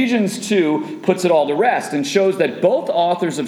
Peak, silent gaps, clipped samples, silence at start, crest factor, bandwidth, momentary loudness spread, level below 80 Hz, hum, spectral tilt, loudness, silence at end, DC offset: -2 dBFS; none; under 0.1%; 0 s; 14 dB; 15 kHz; 4 LU; -72 dBFS; none; -5 dB/octave; -17 LUFS; 0 s; under 0.1%